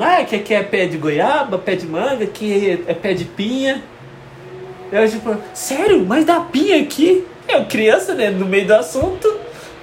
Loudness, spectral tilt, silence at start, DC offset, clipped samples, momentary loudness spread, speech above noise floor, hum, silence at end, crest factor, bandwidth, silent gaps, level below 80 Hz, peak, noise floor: -16 LUFS; -5 dB/octave; 0 s; under 0.1%; under 0.1%; 9 LU; 21 dB; none; 0 s; 16 dB; 16.5 kHz; none; -48 dBFS; 0 dBFS; -37 dBFS